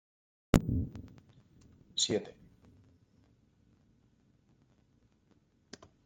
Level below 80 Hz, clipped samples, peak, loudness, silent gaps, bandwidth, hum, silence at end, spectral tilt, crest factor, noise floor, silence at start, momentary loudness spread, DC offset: -50 dBFS; under 0.1%; -6 dBFS; -33 LUFS; none; 16.5 kHz; none; 3.75 s; -4.5 dB/octave; 32 dB; -70 dBFS; 0.55 s; 25 LU; under 0.1%